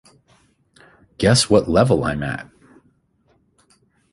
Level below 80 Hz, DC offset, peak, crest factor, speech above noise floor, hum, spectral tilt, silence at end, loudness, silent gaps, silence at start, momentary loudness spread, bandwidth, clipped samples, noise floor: -42 dBFS; under 0.1%; -2 dBFS; 20 dB; 45 dB; none; -5 dB/octave; 1.7 s; -17 LUFS; none; 1.2 s; 12 LU; 11.5 kHz; under 0.1%; -62 dBFS